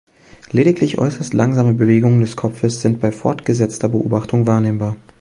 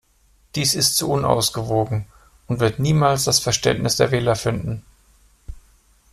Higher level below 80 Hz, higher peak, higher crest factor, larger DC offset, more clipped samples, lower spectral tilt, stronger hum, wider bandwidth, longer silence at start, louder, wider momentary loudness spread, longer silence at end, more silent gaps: second, -50 dBFS vs -44 dBFS; about the same, 0 dBFS vs 0 dBFS; about the same, 16 dB vs 20 dB; neither; neither; first, -7.5 dB/octave vs -4 dB/octave; neither; second, 11 kHz vs 15.5 kHz; about the same, 0.55 s vs 0.55 s; first, -16 LUFS vs -19 LUFS; second, 7 LU vs 11 LU; second, 0.25 s vs 0.55 s; neither